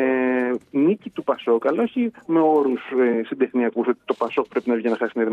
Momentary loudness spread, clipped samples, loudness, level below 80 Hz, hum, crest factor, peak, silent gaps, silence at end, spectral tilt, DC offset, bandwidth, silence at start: 5 LU; under 0.1%; -22 LUFS; -74 dBFS; none; 14 dB; -8 dBFS; none; 0 s; -8 dB/octave; under 0.1%; 5.2 kHz; 0 s